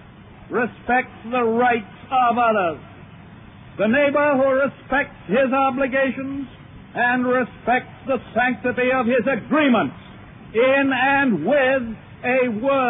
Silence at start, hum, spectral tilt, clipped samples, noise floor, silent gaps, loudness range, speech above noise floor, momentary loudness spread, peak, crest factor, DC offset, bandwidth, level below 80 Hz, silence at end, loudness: 0.2 s; none; -9.5 dB/octave; under 0.1%; -43 dBFS; none; 2 LU; 23 dB; 10 LU; -6 dBFS; 14 dB; under 0.1%; 3.9 kHz; -52 dBFS; 0 s; -20 LUFS